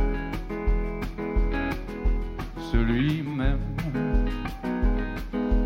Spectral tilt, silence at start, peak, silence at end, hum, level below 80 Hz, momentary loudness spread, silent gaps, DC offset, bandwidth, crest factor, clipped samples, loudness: -8 dB/octave; 0 s; -8 dBFS; 0 s; none; -28 dBFS; 7 LU; none; under 0.1%; 6.4 kHz; 16 dB; under 0.1%; -29 LUFS